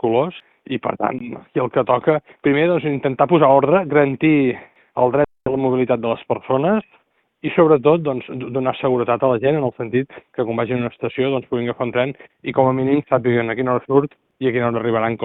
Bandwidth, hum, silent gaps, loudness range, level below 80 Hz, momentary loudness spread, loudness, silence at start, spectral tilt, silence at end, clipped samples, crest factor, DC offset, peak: 4.1 kHz; none; none; 4 LU; -56 dBFS; 10 LU; -19 LUFS; 0.05 s; -11.5 dB/octave; 0 s; under 0.1%; 18 dB; under 0.1%; 0 dBFS